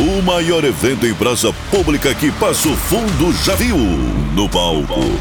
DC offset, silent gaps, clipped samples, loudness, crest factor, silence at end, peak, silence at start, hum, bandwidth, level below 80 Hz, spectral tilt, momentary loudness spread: under 0.1%; none; under 0.1%; -15 LUFS; 12 dB; 0 s; -2 dBFS; 0 s; none; over 20 kHz; -24 dBFS; -4.5 dB/octave; 3 LU